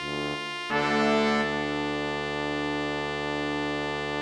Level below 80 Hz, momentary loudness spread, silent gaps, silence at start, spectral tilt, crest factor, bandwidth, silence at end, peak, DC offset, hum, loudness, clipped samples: -52 dBFS; 6 LU; none; 0 s; -4.5 dB/octave; 16 dB; 12 kHz; 0 s; -12 dBFS; under 0.1%; none; -28 LUFS; under 0.1%